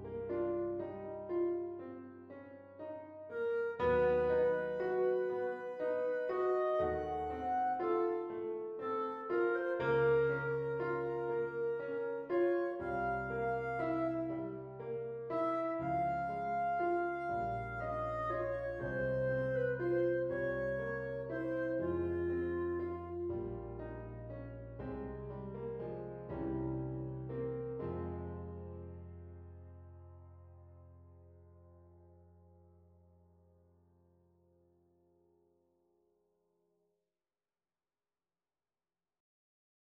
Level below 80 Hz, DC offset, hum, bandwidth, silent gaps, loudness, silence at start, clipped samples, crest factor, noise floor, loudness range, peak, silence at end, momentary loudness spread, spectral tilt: -60 dBFS; under 0.1%; none; 5.4 kHz; none; -37 LUFS; 0 s; under 0.1%; 16 dB; under -90 dBFS; 9 LU; -22 dBFS; 7.6 s; 14 LU; -9.5 dB/octave